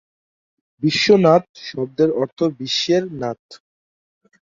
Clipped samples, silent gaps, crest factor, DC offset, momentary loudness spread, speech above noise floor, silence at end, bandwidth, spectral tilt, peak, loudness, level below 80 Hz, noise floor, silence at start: under 0.1%; 1.49-1.54 s, 2.32-2.36 s, 3.39-3.49 s; 18 dB; under 0.1%; 14 LU; over 72 dB; 0.85 s; 7.6 kHz; -5 dB/octave; -2 dBFS; -18 LUFS; -60 dBFS; under -90 dBFS; 0.8 s